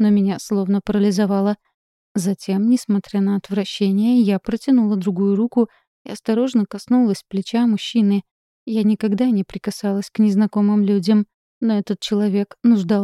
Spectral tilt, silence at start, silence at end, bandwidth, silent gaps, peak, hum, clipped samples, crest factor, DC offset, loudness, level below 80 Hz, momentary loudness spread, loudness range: -7 dB/octave; 0 s; 0 s; 12.5 kHz; 1.74-2.15 s, 5.87-6.05 s, 8.31-8.66 s, 11.34-11.61 s; -6 dBFS; none; under 0.1%; 12 dB; under 0.1%; -19 LUFS; -56 dBFS; 7 LU; 2 LU